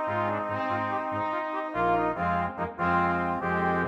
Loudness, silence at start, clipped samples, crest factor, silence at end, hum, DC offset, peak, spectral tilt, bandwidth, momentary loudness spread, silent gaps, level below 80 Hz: -28 LUFS; 0 s; under 0.1%; 14 dB; 0 s; none; under 0.1%; -14 dBFS; -8 dB/octave; 7.8 kHz; 4 LU; none; -54 dBFS